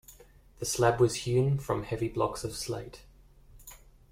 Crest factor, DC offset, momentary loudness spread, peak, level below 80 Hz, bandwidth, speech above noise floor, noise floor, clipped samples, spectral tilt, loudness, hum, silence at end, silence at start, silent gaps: 20 dB; under 0.1%; 23 LU; -12 dBFS; -52 dBFS; 16.5 kHz; 27 dB; -56 dBFS; under 0.1%; -5.5 dB/octave; -30 LUFS; none; 0.35 s; 0.1 s; none